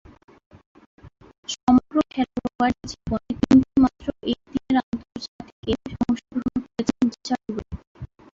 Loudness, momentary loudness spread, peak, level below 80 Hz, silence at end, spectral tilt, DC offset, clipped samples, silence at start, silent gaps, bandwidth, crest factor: -24 LUFS; 18 LU; -6 dBFS; -46 dBFS; 0.3 s; -5.5 dB/octave; under 0.1%; under 0.1%; 1.05 s; 1.38-1.43 s, 1.63-1.67 s, 2.55-2.59 s, 4.83-4.92 s, 5.28-5.39 s, 5.52-5.63 s, 7.87-7.95 s; 7.6 kHz; 18 dB